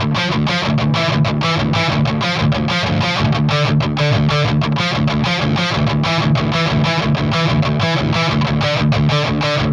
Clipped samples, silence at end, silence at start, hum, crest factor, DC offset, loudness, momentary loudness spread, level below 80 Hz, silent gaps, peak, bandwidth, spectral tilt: under 0.1%; 0 s; 0 s; none; 12 dB; under 0.1%; -16 LUFS; 1 LU; -34 dBFS; none; -4 dBFS; 9.4 kHz; -6 dB/octave